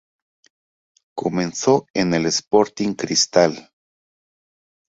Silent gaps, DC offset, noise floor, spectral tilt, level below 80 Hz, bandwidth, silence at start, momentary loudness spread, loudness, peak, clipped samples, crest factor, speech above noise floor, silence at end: 1.90-1.94 s; under 0.1%; under -90 dBFS; -4 dB/octave; -58 dBFS; 8 kHz; 1.15 s; 9 LU; -19 LUFS; -2 dBFS; under 0.1%; 20 dB; over 71 dB; 1.35 s